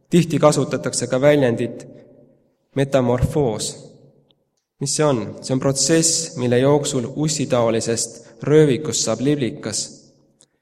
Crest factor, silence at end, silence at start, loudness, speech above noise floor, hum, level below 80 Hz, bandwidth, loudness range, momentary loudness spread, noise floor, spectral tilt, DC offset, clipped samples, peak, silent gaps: 20 dB; 0.65 s; 0.1 s; -19 LUFS; 46 dB; none; -46 dBFS; 15.5 kHz; 4 LU; 11 LU; -65 dBFS; -4.5 dB/octave; under 0.1%; under 0.1%; 0 dBFS; none